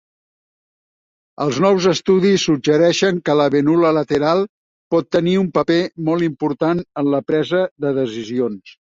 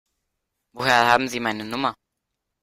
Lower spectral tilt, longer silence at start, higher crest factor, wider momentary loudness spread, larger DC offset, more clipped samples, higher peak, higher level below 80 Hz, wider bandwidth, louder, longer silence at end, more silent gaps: first, -6 dB/octave vs -3.5 dB/octave; first, 1.4 s vs 0.75 s; second, 14 dB vs 24 dB; second, 7 LU vs 10 LU; neither; neither; about the same, -2 dBFS vs -2 dBFS; about the same, -58 dBFS vs -62 dBFS; second, 7.8 kHz vs 16 kHz; first, -17 LUFS vs -21 LUFS; second, 0.1 s vs 0.7 s; first, 4.49-4.91 s, 7.71-7.76 s vs none